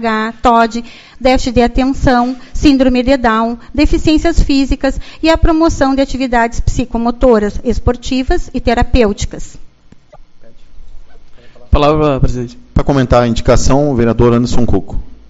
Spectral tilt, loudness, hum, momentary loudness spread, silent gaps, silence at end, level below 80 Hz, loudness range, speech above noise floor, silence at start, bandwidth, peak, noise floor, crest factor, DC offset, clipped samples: -6 dB/octave; -13 LUFS; none; 7 LU; none; 0.15 s; -20 dBFS; 6 LU; 29 dB; 0 s; 8 kHz; 0 dBFS; -40 dBFS; 12 dB; under 0.1%; 0.3%